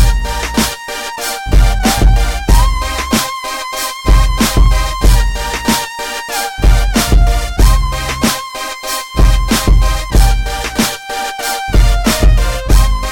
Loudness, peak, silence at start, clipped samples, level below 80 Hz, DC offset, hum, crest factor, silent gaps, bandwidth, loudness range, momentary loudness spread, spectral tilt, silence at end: -14 LUFS; 0 dBFS; 0 s; under 0.1%; -12 dBFS; under 0.1%; none; 10 dB; none; 17.5 kHz; 1 LU; 7 LU; -4 dB/octave; 0 s